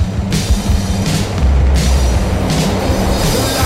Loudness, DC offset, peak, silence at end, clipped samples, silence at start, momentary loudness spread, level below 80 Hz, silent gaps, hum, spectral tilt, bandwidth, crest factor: -15 LUFS; under 0.1%; -2 dBFS; 0 s; under 0.1%; 0 s; 3 LU; -16 dBFS; none; none; -5 dB/octave; 16 kHz; 10 dB